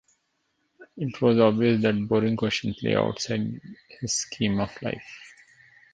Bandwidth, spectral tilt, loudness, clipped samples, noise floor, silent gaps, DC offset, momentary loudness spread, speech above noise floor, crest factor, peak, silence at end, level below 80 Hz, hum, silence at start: 9.6 kHz; -5 dB/octave; -25 LUFS; under 0.1%; -74 dBFS; none; under 0.1%; 16 LU; 49 dB; 22 dB; -4 dBFS; 0.65 s; -56 dBFS; none; 0.8 s